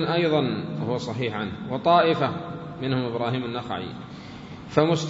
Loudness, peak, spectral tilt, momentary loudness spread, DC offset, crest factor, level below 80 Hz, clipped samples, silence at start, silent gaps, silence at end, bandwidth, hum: -25 LUFS; -4 dBFS; -6.5 dB/octave; 18 LU; under 0.1%; 22 dB; -58 dBFS; under 0.1%; 0 s; none; 0 s; 7.8 kHz; none